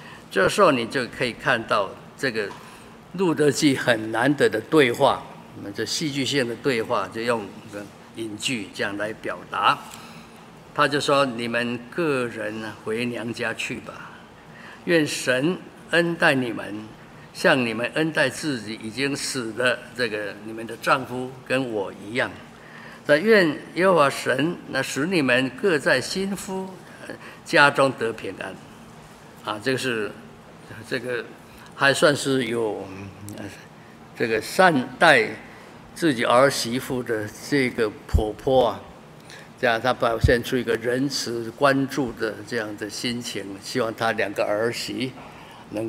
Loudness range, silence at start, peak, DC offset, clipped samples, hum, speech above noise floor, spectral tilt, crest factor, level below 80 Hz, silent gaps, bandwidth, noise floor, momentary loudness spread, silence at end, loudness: 6 LU; 0 s; 0 dBFS; under 0.1%; under 0.1%; none; 22 dB; -4.5 dB/octave; 24 dB; -46 dBFS; none; 16 kHz; -45 dBFS; 20 LU; 0 s; -23 LUFS